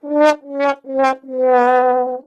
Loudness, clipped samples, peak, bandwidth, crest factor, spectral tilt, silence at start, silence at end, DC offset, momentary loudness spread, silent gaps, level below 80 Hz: -16 LUFS; under 0.1%; -2 dBFS; 10 kHz; 14 dB; -3.5 dB/octave; 0.05 s; 0.05 s; under 0.1%; 6 LU; none; -70 dBFS